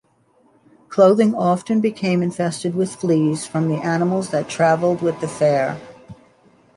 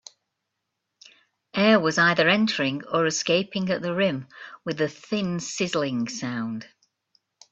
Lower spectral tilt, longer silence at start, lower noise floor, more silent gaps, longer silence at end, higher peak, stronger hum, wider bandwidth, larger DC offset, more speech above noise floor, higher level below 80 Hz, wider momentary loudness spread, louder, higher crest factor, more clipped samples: first, -6.5 dB/octave vs -4 dB/octave; second, 0.9 s vs 1.55 s; second, -58 dBFS vs -81 dBFS; neither; second, 0.65 s vs 0.85 s; about the same, -2 dBFS vs -4 dBFS; neither; first, 11.5 kHz vs 8.2 kHz; neither; second, 40 dB vs 56 dB; about the same, -62 dBFS vs -66 dBFS; second, 8 LU vs 14 LU; first, -19 LUFS vs -24 LUFS; second, 16 dB vs 22 dB; neither